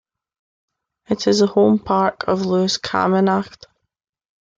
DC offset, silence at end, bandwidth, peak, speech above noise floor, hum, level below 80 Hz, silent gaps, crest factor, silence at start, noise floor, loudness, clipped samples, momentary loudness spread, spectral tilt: under 0.1%; 1.1 s; 7.8 kHz; -4 dBFS; 61 dB; none; -56 dBFS; none; 16 dB; 1.1 s; -78 dBFS; -18 LUFS; under 0.1%; 7 LU; -5.5 dB/octave